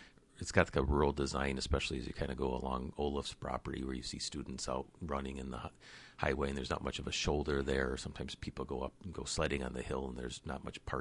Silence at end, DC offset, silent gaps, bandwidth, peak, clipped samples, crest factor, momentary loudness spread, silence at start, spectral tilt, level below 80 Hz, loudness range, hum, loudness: 0 s; under 0.1%; none; 11.5 kHz; -12 dBFS; under 0.1%; 26 dB; 11 LU; 0 s; -4.5 dB/octave; -46 dBFS; 5 LU; none; -38 LUFS